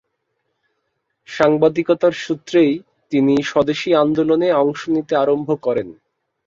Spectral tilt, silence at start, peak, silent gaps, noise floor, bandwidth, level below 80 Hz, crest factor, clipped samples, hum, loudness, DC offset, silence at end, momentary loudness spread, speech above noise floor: -6.5 dB/octave; 1.3 s; -2 dBFS; none; -72 dBFS; 7.6 kHz; -58 dBFS; 16 dB; under 0.1%; none; -17 LUFS; under 0.1%; 0.55 s; 7 LU; 56 dB